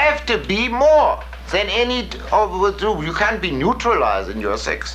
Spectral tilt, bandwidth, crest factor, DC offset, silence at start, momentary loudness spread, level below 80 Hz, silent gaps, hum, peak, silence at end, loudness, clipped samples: -4.5 dB/octave; 14.5 kHz; 14 dB; under 0.1%; 0 s; 8 LU; -34 dBFS; none; none; -4 dBFS; 0 s; -18 LUFS; under 0.1%